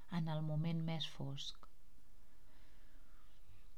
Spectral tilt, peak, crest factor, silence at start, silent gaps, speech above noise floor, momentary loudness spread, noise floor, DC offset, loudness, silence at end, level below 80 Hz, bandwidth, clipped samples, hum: -6.5 dB/octave; -28 dBFS; 16 dB; 0.05 s; none; 22 dB; 9 LU; -64 dBFS; 0.6%; -43 LUFS; 0 s; -62 dBFS; 11.5 kHz; under 0.1%; none